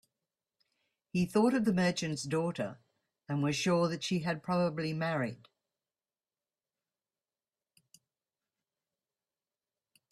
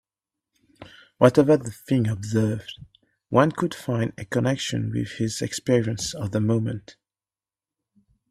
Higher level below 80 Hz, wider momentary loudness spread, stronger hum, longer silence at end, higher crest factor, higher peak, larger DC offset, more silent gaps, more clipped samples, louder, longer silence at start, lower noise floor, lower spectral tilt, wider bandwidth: second, -72 dBFS vs -56 dBFS; about the same, 9 LU vs 9 LU; neither; first, 4.75 s vs 1.4 s; about the same, 20 dB vs 24 dB; second, -14 dBFS vs 0 dBFS; neither; neither; neither; second, -32 LUFS vs -24 LUFS; first, 1.15 s vs 0.8 s; about the same, under -90 dBFS vs under -90 dBFS; about the same, -5.5 dB/octave vs -6 dB/octave; about the same, 13 kHz vs 14 kHz